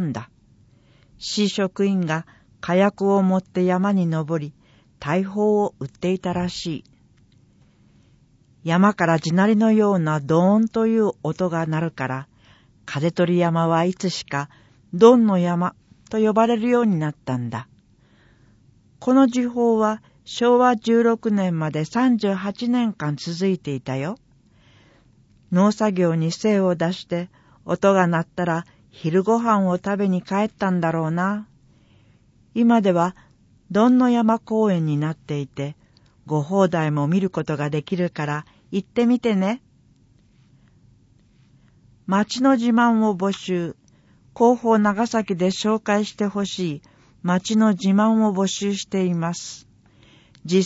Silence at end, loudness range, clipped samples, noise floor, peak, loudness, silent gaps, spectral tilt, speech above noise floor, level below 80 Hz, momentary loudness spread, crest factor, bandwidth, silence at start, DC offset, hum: 0 s; 5 LU; under 0.1%; -56 dBFS; 0 dBFS; -21 LUFS; none; -6.5 dB/octave; 36 dB; -60 dBFS; 12 LU; 20 dB; 8 kHz; 0 s; under 0.1%; none